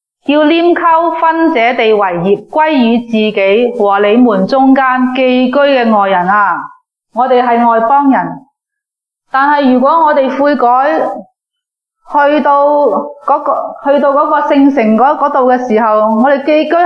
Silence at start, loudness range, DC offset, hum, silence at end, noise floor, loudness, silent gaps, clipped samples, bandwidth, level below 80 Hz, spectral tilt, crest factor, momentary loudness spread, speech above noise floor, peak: 0.3 s; 2 LU; under 0.1%; none; 0 s; -80 dBFS; -9 LUFS; none; under 0.1%; 6.4 kHz; -58 dBFS; -7 dB/octave; 10 dB; 5 LU; 71 dB; 0 dBFS